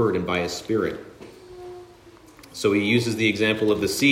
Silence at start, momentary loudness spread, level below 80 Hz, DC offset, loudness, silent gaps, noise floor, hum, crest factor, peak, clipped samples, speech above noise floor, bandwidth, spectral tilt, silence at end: 0 s; 22 LU; -56 dBFS; under 0.1%; -22 LUFS; none; -49 dBFS; none; 18 dB; -6 dBFS; under 0.1%; 27 dB; 16 kHz; -4.5 dB/octave; 0 s